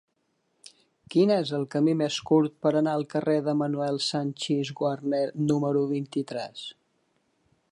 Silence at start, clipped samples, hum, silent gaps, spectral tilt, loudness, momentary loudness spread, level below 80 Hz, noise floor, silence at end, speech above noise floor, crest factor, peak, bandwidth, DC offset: 1.1 s; under 0.1%; none; none; -6 dB/octave; -26 LUFS; 8 LU; -72 dBFS; -74 dBFS; 1 s; 48 dB; 16 dB; -10 dBFS; 11.5 kHz; under 0.1%